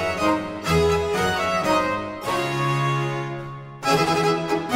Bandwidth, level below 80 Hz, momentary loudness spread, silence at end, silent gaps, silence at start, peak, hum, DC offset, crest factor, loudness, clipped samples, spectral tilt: 16 kHz; -44 dBFS; 8 LU; 0 s; none; 0 s; -8 dBFS; none; under 0.1%; 14 dB; -22 LUFS; under 0.1%; -5 dB/octave